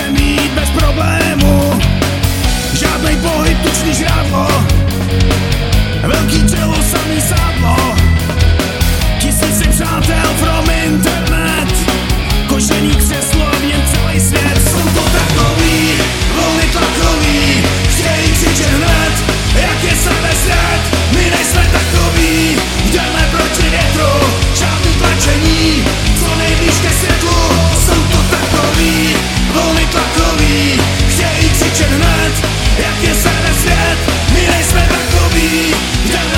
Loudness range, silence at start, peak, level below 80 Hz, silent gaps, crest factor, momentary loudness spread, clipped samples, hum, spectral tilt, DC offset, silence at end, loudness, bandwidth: 1 LU; 0 s; 0 dBFS; -16 dBFS; none; 10 dB; 3 LU; under 0.1%; none; -4 dB/octave; under 0.1%; 0 s; -11 LUFS; 17 kHz